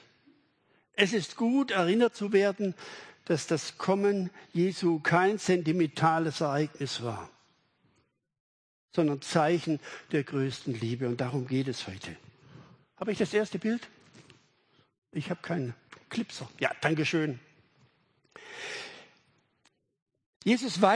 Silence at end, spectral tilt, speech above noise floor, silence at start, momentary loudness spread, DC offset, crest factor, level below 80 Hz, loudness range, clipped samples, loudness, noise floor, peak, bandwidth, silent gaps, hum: 0 s; -5.5 dB/octave; 44 dB; 0.95 s; 14 LU; under 0.1%; 24 dB; -74 dBFS; 8 LU; under 0.1%; -30 LUFS; -73 dBFS; -8 dBFS; 10.5 kHz; 8.40-8.88 s, 14.98-15.02 s, 20.02-20.06 s, 20.26-20.40 s; none